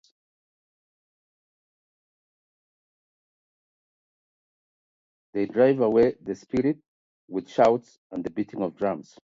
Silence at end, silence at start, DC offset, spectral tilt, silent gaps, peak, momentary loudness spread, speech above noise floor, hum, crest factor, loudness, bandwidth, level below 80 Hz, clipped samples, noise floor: 0.25 s; 5.35 s; under 0.1%; -7.5 dB/octave; 6.88-7.28 s, 7.98-8.10 s; -6 dBFS; 14 LU; over 66 dB; none; 22 dB; -25 LUFS; 7.6 kHz; -64 dBFS; under 0.1%; under -90 dBFS